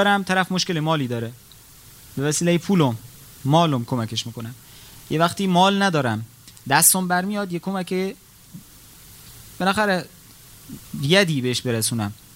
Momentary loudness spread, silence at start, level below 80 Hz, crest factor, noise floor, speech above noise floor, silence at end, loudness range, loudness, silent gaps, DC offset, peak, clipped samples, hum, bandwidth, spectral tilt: 19 LU; 0 s; -56 dBFS; 22 dB; -47 dBFS; 26 dB; 0.2 s; 6 LU; -21 LUFS; none; under 0.1%; 0 dBFS; under 0.1%; none; 16 kHz; -4 dB/octave